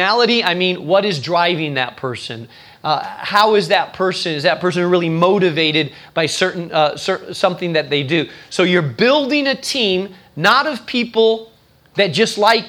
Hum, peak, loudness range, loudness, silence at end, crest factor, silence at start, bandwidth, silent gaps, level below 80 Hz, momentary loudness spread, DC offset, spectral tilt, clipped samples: none; 0 dBFS; 2 LU; -16 LUFS; 0 s; 16 dB; 0 s; 19.5 kHz; none; -62 dBFS; 9 LU; under 0.1%; -4.5 dB/octave; under 0.1%